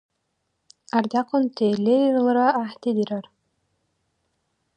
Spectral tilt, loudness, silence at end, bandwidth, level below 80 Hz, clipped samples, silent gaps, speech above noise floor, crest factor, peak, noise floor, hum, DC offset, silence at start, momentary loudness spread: -7 dB/octave; -22 LUFS; 1.55 s; 9.2 kHz; -76 dBFS; under 0.1%; none; 54 dB; 20 dB; -4 dBFS; -75 dBFS; none; under 0.1%; 0.95 s; 7 LU